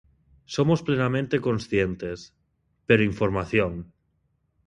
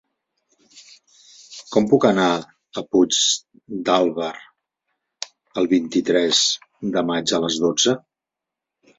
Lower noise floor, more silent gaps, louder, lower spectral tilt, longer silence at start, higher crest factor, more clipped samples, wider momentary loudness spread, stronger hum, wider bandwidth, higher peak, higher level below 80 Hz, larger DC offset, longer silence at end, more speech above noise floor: second, -71 dBFS vs -86 dBFS; neither; second, -24 LUFS vs -19 LUFS; first, -7 dB/octave vs -3 dB/octave; second, 0.5 s vs 0.75 s; about the same, 22 dB vs 20 dB; neither; second, 14 LU vs 17 LU; neither; first, 10.5 kHz vs 8 kHz; about the same, -4 dBFS vs -2 dBFS; first, -48 dBFS vs -62 dBFS; neither; second, 0.85 s vs 1 s; second, 47 dB vs 66 dB